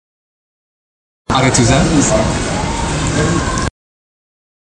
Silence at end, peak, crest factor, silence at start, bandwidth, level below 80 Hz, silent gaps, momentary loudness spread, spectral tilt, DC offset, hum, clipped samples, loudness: 0.95 s; 0 dBFS; 16 dB; 1.3 s; 11 kHz; -28 dBFS; none; 8 LU; -4.5 dB/octave; under 0.1%; none; under 0.1%; -14 LUFS